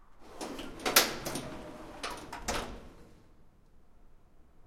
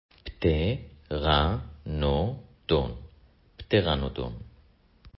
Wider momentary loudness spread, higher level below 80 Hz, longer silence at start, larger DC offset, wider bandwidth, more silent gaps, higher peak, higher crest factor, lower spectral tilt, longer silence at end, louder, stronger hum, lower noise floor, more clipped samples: first, 21 LU vs 15 LU; second, -52 dBFS vs -36 dBFS; second, 0 s vs 0.25 s; neither; first, 16.5 kHz vs 5.8 kHz; neither; about the same, -6 dBFS vs -8 dBFS; first, 30 dB vs 22 dB; second, -1.5 dB/octave vs -10.5 dB/octave; about the same, 0 s vs 0.1 s; second, -32 LUFS vs -28 LUFS; neither; about the same, -58 dBFS vs -59 dBFS; neither